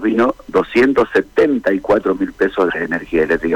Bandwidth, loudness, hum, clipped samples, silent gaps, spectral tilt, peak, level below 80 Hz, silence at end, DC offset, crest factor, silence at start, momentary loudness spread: 11.5 kHz; -16 LUFS; none; under 0.1%; none; -6.5 dB/octave; -6 dBFS; -44 dBFS; 0 s; under 0.1%; 10 dB; 0 s; 5 LU